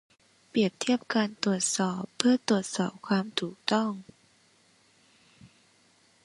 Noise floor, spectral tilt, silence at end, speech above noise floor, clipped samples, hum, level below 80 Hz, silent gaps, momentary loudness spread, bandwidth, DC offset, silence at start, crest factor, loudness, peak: -64 dBFS; -4 dB/octave; 0.8 s; 36 dB; under 0.1%; none; -74 dBFS; none; 7 LU; 11.5 kHz; under 0.1%; 0.55 s; 28 dB; -28 LUFS; -4 dBFS